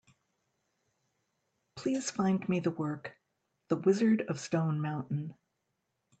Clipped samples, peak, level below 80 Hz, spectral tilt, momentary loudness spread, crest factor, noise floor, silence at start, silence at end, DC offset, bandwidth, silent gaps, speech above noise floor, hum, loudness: under 0.1%; -16 dBFS; -76 dBFS; -6.5 dB/octave; 13 LU; 20 dB; -82 dBFS; 1.75 s; 0.85 s; under 0.1%; 9 kHz; none; 51 dB; none; -32 LUFS